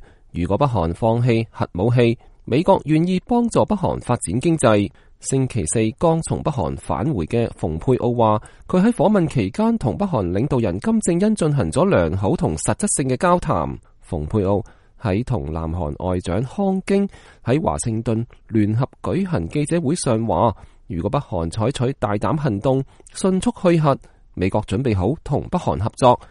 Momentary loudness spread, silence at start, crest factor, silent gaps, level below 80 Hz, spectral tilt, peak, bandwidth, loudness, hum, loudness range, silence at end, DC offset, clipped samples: 8 LU; 0.35 s; 18 dB; none; -40 dBFS; -6.5 dB/octave; -2 dBFS; 11.5 kHz; -20 LUFS; none; 3 LU; 0.05 s; under 0.1%; under 0.1%